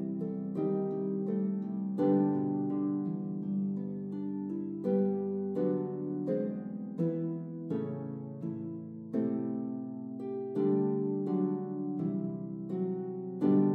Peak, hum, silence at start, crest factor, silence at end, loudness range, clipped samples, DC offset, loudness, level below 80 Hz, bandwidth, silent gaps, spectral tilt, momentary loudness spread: -16 dBFS; none; 0 s; 16 dB; 0 s; 4 LU; under 0.1%; under 0.1%; -34 LUFS; -82 dBFS; 3.7 kHz; none; -12 dB/octave; 10 LU